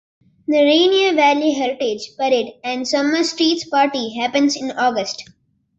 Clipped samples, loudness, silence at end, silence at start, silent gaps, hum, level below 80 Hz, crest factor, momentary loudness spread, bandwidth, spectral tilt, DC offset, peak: under 0.1%; -17 LUFS; 0.55 s; 0.5 s; none; none; -64 dBFS; 16 dB; 10 LU; 8.2 kHz; -2.5 dB/octave; under 0.1%; -2 dBFS